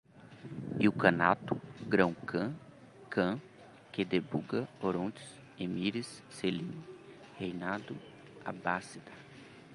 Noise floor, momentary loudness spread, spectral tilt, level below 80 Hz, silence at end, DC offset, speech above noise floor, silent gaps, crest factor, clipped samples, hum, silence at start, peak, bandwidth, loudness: -54 dBFS; 22 LU; -6.5 dB/octave; -68 dBFS; 0 s; under 0.1%; 20 dB; none; 28 dB; under 0.1%; none; 0.15 s; -8 dBFS; 11.5 kHz; -34 LUFS